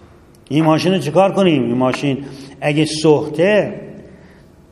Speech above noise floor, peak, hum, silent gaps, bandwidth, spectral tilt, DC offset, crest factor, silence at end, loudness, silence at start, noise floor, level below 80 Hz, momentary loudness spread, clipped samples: 29 dB; 0 dBFS; none; none; 12.5 kHz; -6 dB/octave; under 0.1%; 16 dB; 0.65 s; -16 LUFS; 0.5 s; -44 dBFS; -52 dBFS; 11 LU; under 0.1%